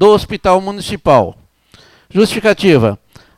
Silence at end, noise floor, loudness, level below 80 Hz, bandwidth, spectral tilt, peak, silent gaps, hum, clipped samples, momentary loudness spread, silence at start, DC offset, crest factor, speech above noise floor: 0.4 s; -47 dBFS; -13 LUFS; -38 dBFS; 14.5 kHz; -6 dB/octave; 0 dBFS; none; none; under 0.1%; 10 LU; 0 s; under 0.1%; 12 dB; 35 dB